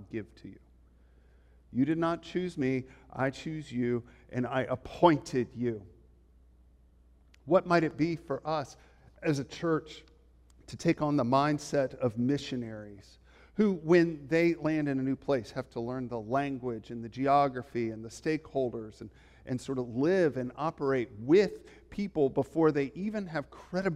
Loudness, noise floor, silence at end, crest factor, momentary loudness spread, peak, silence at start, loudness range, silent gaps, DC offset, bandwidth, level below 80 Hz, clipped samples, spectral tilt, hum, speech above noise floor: -31 LUFS; -61 dBFS; 0 s; 22 dB; 16 LU; -10 dBFS; 0 s; 4 LU; none; under 0.1%; 11.5 kHz; -60 dBFS; under 0.1%; -7 dB/octave; none; 31 dB